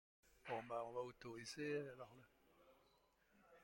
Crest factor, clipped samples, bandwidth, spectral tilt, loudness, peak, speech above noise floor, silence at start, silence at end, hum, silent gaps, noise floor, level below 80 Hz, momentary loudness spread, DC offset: 18 dB; under 0.1%; 16.5 kHz; -4.5 dB/octave; -50 LUFS; -34 dBFS; 27 dB; 0.25 s; 0 s; none; none; -78 dBFS; -82 dBFS; 15 LU; under 0.1%